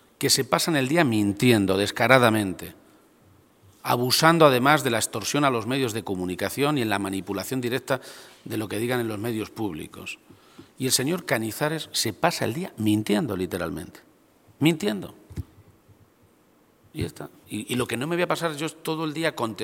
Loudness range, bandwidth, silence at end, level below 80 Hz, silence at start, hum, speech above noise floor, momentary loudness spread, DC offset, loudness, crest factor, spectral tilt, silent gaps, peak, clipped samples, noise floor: 9 LU; 17 kHz; 0 s; -58 dBFS; 0.2 s; none; 36 dB; 17 LU; under 0.1%; -24 LUFS; 24 dB; -4 dB/octave; none; 0 dBFS; under 0.1%; -60 dBFS